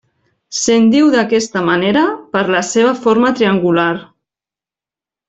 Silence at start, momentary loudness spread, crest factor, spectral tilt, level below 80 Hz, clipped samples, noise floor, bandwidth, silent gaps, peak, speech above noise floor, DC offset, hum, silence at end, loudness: 0.5 s; 7 LU; 12 dB; -4.5 dB/octave; -54 dBFS; under 0.1%; -89 dBFS; 8.4 kHz; none; -2 dBFS; 77 dB; under 0.1%; none; 1.25 s; -13 LUFS